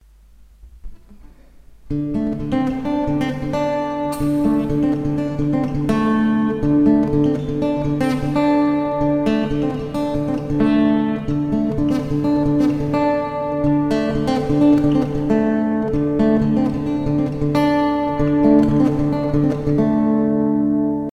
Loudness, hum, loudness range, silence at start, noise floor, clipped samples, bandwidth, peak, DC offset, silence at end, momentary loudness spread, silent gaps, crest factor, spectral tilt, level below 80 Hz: -18 LUFS; none; 4 LU; 0.65 s; -47 dBFS; under 0.1%; 10 kHz; -2 dBFS; under 0.1%; 0 s; 6 LU; none; 16 dB; -8.5 dB/octave; -36 dBFS